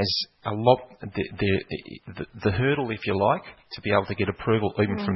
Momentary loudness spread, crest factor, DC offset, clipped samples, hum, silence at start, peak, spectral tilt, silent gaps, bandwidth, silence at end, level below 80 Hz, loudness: 14 LU; 22 dB; under 0.1%; under 0.1%; none; 0 s; -4 dBFS; -7.5 dB/octave; none; 6 kHz; 0 s; -52 dBFS; -25 LUFS